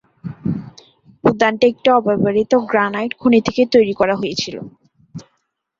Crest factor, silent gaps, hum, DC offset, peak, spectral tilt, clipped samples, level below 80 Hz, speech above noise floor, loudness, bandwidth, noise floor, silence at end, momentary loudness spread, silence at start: 16 dB; none; none; under 0.1%; -2 dBFS; -6 dB/octave; under 0.1%; -54 dBFS; 54 dB; -16 LUFS; 7.6 kHz; -69 dBFS; 0.6 s; 19 LU; 0.25 s